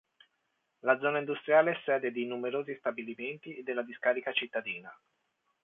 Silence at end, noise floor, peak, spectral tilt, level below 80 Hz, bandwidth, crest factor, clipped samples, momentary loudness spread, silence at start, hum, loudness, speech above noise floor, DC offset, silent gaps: 0.7 s; -79 dBFS; -12 dBFS; -7.5 dB/octave; -86 dBFS; 3.9 kHz; 20 dB; under 0.1%; 13 LU; 0.85 s; none; -32 LUFS; 48 dB; under 0.1%; none